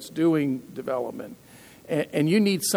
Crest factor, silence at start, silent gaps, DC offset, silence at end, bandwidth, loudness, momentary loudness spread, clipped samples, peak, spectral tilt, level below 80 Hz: 16 dB; 0 s; none; under 0.1%; 0 s; over 20 kHz; -25 LUFS; 13 LU; under 0.1%; -10 dBFS; -5 dB/octave; -68 dBFS